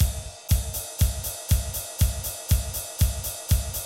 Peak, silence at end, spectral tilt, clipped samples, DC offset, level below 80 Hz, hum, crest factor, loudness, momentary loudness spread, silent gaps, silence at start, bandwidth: -8 dBFS; 0 s; -4 dB/octave; under 0.1%; under 0.1%; -28 dBFS; none; 16 dB; -27 LUFS; 5 LU; none; 0 s; 16.5 kHz